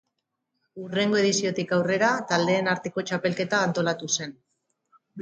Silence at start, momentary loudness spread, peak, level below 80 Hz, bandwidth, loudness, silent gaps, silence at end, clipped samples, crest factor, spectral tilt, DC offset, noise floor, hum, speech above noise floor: 0.75 s; 6 LU; -8 dBFS; -72 dBFS; 9.4 kHz; -25 LUFS; none; 0 s; under 0.1%; 18 dB; -4 dB/octave; under 0.1%; -80 dBFS; none; 55 dB